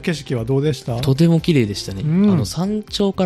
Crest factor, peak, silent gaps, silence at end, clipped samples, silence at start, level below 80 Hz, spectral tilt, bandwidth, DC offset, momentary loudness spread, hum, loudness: 14 dB; -4 dBFS; none; 0 s; under 0.1%; 0 s; -42 dBFS; -6.5 dB/octave; 13.5 kHz; under 0.1%; 7 LU; none; -18 LUFS